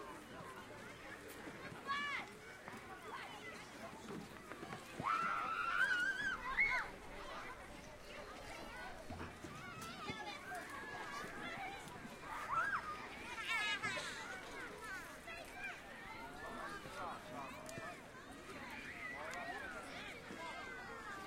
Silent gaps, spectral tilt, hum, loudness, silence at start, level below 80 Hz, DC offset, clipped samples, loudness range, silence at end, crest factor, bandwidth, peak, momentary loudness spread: none; -3 dB/octave; none; -45 LUFS; 0 s; -66 dBFS; under 0.1%; under 0.1%; 10 LU; 0 s; 20 dB; 16 kHz; -26 dBFS; 14 LU